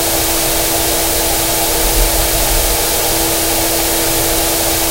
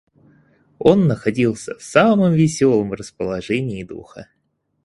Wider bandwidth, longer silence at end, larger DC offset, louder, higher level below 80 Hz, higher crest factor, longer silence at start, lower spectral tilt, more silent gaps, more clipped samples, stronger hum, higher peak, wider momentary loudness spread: first, 16.5 kHz vs 11.5 kHz; second, 0 s vs 0.6 s; neither; first, -12 LUFS vs -18 LUFS; first, -22 dBFS vs -50 dBFS; about the same, 14 dB vs 18 dB; second, 0 s vs 0.8 s; second, -2 dB/octave vs -6.5 dB/octave; neither; neither; neither; about the same, 0 dBFS vs 0 dBFS; second, 0 LU vs 14 LU